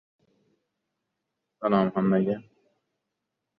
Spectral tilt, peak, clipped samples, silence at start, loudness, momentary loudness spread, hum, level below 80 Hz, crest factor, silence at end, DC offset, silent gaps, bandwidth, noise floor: -11 dB/octave; -10 dBFS; under 0.1%; 1.6 s; -26 LUFS; 8 LU; none; -68 dBFS; 20 dB; 1.2 s; under 0.1%; none; 4.9 kHz; -83 dBFS